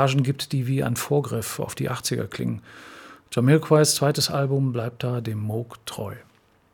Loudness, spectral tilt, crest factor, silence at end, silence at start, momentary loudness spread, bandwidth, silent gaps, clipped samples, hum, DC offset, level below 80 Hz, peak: -24 LUFS; -5 dB/octave; 20 dB; 0.5 s; 0 s; 16 LU; 19 kHz; none; under 0.1%; none; under 0.1%; -60 dBFS; -4 dBFS